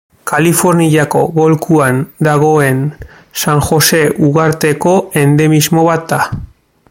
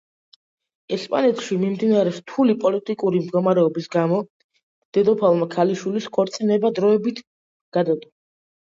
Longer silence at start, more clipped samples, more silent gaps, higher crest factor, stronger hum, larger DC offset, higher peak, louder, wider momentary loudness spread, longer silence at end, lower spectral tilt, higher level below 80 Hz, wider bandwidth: second, 0.25 s vs 0.9 s; neither; second, none vs 4.30-4.49 s, 4.63-4.92 s, 7.27-7.72 s; second, 10 dB vs 16 dB; neither; neither; first, 0 dBFS vs -4 dBFS; first, -11 LUFS vs -21 LUFS; about the same, 7 LU vs 7 LU; second, 0.45 s vs 0.6 s; second, -5 dB/octave vs -7 dB/octave; first, -40 dBFS vs -68 dBFS; first, 17 kHz vs 7.8 kHz